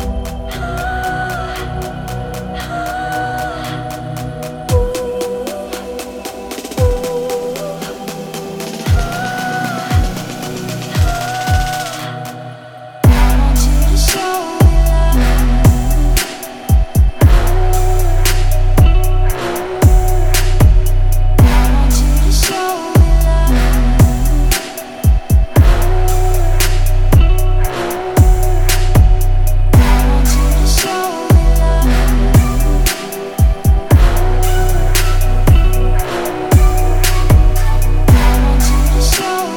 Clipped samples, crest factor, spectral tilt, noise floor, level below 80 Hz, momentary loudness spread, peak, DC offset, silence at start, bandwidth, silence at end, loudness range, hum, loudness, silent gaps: under 0.1%; 12 dB; -5.5 dB/octave; -32 dBFS; -12 dBFS; 12 LU; 0 dBFS; under 0.1%; 0 s; 19 kHz; 0 s; 8 LU; none; -14 LUFS; none